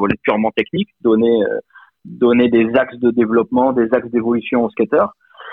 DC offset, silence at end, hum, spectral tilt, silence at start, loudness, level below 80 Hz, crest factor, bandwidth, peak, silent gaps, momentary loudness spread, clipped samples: under 0.1%; 0 s; none; -9.5 dB/octave; 0 s; -16 LUFS; -52 dBFS; 16 dB; 4 kHz; 0 dBFS; none; 6 LU; under 0.1%